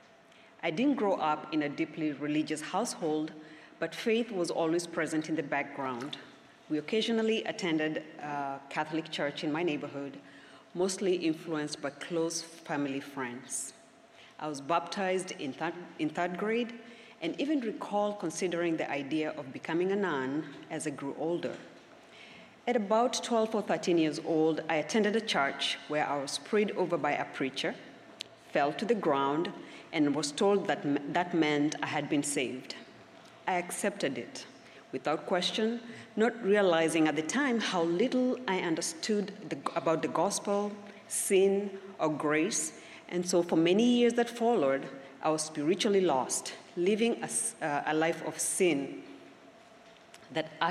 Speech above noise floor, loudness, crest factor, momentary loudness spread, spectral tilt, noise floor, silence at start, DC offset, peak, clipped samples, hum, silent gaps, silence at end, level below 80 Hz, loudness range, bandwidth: 27 dB; -31 LUFS; 20 dB; 12 LU; -4 dB/octave; -58 dBFS; 0.65 s; under 0.1%; -12 dBFS; under 0.1%; none; none; 0 s; -80 dBFS; 6 LU; 14.5 kHz